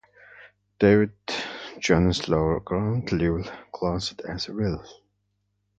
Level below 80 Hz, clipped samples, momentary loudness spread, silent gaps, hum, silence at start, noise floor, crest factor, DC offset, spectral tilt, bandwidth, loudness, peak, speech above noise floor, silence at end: -42 dBFS; under 0.1%; 12 LU; none; 50 Hz at -45 dBFS; 0.35 s; -74 dBFS; 20 dB; under 0.1%; -6 dB/octave; 9 kHz; -25 LUFS; -6 dBFS; 50 dB; 0.85 s